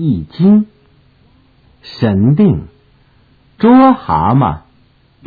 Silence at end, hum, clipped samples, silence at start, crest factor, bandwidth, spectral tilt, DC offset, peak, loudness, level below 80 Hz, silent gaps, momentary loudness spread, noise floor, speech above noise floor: 0.65 s; none; under 0.1%; 0 s; 12 dB; 4.9 kHz; -11 dB/octave; under 0.1%; 0 dBFS; -11 LUFS; -40 dBFS; none; 13 LU; -50 dBFS; 40 dB